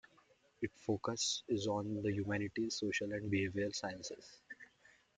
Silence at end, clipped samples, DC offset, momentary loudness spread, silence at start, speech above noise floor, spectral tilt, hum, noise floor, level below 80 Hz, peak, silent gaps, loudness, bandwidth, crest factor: 0.5 s; under 0.1%; under 0.1%; 16 LU; 0.6 s; 31 dB; -4 dB/octave; none; -70 dBFS; -72 dBFS; -22 dBFS; none; -39 LUFS; 9.6 kHz; 18 dB